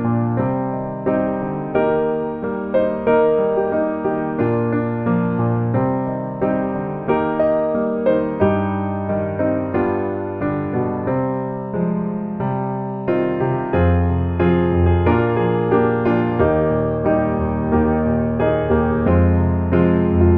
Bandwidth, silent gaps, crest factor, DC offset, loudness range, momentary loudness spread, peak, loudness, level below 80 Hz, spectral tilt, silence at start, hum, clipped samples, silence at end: 4 kHz; none; 16 dB; under 0.1%; 4 LU; 6 LU; -2 dBFS; -19 LUFS; -34 dBFS; -12 dB/octave; 0 s; none; under 0.1%; 0 s